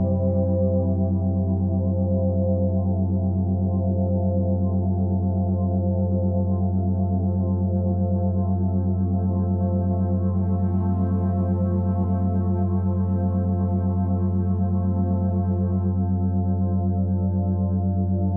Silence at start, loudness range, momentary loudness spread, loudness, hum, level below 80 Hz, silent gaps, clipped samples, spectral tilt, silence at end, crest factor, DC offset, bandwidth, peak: 0 s; 0 LU; 1 LU; -23 LUFS; none; -44 dBFS; none; under 0.1%; -15 dB/octave; 0 s; 10 dB; under 0.1%; 1.7 kHz; -10 dBFS